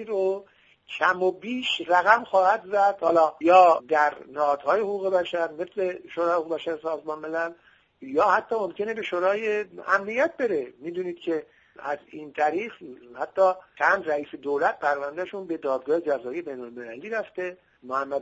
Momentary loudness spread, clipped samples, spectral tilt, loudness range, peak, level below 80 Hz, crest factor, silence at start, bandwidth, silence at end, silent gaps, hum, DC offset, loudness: 13 LU; under 0.1%; -4.5 dB/octave; 8 LU; -4 dBFS; -72 dBFS; 22 dB; 0 s; 7.8 kHz; 0 s; none; none; under 0.1%; -25 LUFS